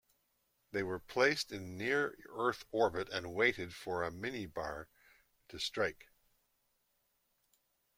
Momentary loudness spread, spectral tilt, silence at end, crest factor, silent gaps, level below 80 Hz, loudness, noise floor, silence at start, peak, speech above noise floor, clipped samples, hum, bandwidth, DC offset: 11 LU; -4 dB/octave; 2.05 s; 24 dB; none; -68 dBFS; -36 LUFS; -79 dBFS; 0.75 s; -16 dBFS; 43 dB; under 0.1%; none; 16.5 kHz; under 0.1%